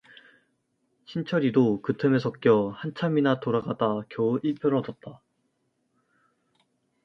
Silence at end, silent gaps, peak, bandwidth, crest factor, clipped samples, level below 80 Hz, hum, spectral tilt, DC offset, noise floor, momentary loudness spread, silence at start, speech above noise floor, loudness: 1.9 s; none; -8 dBFS; 6.2 kHz; 20 dB; under 0.1%; -68 dBFS; none; -8.5 dB/octave; under 0.1%; -74 dBFS; 12 LU; 1.1 s; 49 dB; -26 LUFS